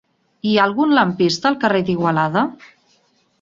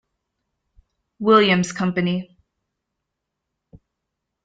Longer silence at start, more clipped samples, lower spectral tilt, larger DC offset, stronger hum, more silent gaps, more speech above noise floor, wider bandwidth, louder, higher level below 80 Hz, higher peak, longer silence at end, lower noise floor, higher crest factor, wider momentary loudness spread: second, 0.45 s vs 1.2 s; neither; about the same, -5.5 dB/octave vs -5.5 dB/octave; neither; neither; neither; second, 43 dB vs 63 dB; second, 7.6 kHz vs 9.2 kHz; about the same, -17 LUFS vs -19 LUFS; about the same, -58 dBFS vs -62 dBFS; about the same, -2 dBFS vs -2 dBFS; second, 0.85 s vs 2.2 s; second, -60 dBFS vs -81 dBFS; second, 16 dB vs 22 dB; second, 5 LU vs 11 LU